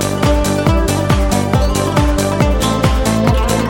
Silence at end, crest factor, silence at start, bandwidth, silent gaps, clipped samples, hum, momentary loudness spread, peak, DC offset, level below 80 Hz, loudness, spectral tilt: 0 s; 12 dB; 0 s; 17 kHz; none; under 0.1%; none; 1 LU; -2 dBFS; under 0.1%; -18 dBFS; -14 LUFS; -5.5 dB/octave